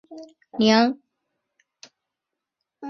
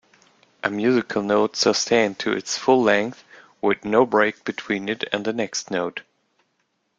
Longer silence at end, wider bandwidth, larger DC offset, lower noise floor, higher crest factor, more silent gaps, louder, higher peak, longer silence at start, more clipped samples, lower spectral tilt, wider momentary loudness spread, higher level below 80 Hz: second, 0 s vs 1 s; second, 6.8 kHz vs 9.2 kHz; neither; first, -85 dBFS vs -71 dBFS; about the same, 24 dB vs 20 dB; neither; about the same, -20 LUFS vs -22 LUFS; about the same, -2 dBFS vs -4 dBFS; second, 0.1 s vs 0.65 s; neither; first, -5 dB/octave vs -3.5 dB/octave; first, 26 LU vs 9 LU; about the same, -68 dBFS vs -64 dBFS